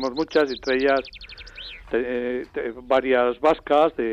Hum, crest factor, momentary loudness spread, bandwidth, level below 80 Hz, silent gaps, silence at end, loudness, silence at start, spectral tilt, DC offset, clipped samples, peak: none; 14 dB; 18 LU; 8 kHz; -50 dBFS; none; 0 s; -22 LUFS; 0 s; -5 dB/octave; under 0.1%; under 0.1%; -8 dBFS